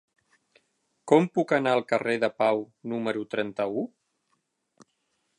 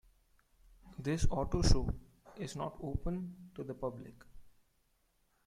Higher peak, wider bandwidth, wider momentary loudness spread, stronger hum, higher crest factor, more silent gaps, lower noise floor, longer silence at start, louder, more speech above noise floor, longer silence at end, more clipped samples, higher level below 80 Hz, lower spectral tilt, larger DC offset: first, -4 dBFS vs -12 dBFS; about the same, 11 kHz vs 11.5 kHz; second, 11 LU vs 18 LU; neither; about the same, 24 dB vs 24 dB; neither; about the same, -75 dBFS vs -75 dBFS; first, 1.05 s vs 0.85 s; first, -26 LUFS vs -38 LUFS; first, 50 dB vs 41 dB; first, 1.55 s vs 0.95 s; neither; second, -78 dBFS vs -42 dBFS; about the same, -6 dB/octave vs -6 dB/octave; neither